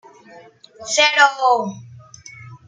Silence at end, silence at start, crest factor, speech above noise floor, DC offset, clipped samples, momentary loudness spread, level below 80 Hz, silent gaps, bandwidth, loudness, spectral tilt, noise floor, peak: 0.1 s; 0.35 s; 20 dB; 28 dB; under 0.1%; under 0.1%; 25 LU; -68 dBFS; none; 9.6 kHz; -15 LUFS; -1 dB/octave; -45 dBFS; 0 dBFS